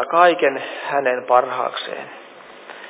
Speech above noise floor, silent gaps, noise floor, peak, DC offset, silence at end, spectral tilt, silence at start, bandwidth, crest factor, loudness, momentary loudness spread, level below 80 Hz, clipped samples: 21 dB; none; -40 dBFS; 0 dBFS; under 0.1%; 0 s; -7.5 dB/octave; 0 s; 4 kHz; 20 dB; -19 LUFS; 23 LU; -80 dBFS; under 0.1%